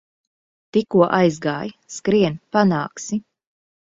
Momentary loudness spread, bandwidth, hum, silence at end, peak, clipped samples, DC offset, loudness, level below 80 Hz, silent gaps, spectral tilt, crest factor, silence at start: 11 LU; 7.8 kHz; none; 0.7 s; -2 dBFS; under 0.1%; under 0.1%; -20 LUFS; -60 dBFS; none; -6 dB/octave; 20 dB; 0.75 s